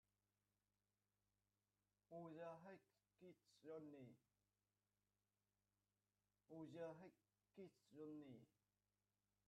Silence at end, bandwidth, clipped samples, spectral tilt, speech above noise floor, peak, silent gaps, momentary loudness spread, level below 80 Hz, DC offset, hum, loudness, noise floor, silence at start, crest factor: 1 s; 8.2 kHz; under 0.1%; -7 dB/octave; over 30 dB; -46 dBFS; none; 11 LU; under -90 dBFS; under 0.1%; 50 Hz at -95 dBFS; -61 LUFS; under -90 dBFS; 2.1 s; 20 dB